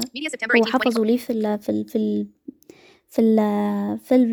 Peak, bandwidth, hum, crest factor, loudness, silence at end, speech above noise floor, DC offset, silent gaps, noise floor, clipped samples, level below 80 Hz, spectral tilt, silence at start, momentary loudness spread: -4 dBFS; 19.5 kHz; none; 18 dB; -21 LUFS; 0 s; 30 dB; under 0.1%; none; -50 dBFS; under 0.1%; -66 dBFS; -5.5 dB/octave; 0 s; 9 LU